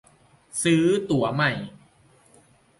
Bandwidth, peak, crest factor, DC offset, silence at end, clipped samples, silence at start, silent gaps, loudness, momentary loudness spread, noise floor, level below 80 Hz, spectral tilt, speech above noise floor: 11.5 kHz; -10 dBFS; 16 dB; under 0.1%; 1.1 s; under 0.1%; 0.55 s; none; -23 LUFS; 14 LU; -58 dBFS; -60 dBFS; -5 dB/octave; 35 dB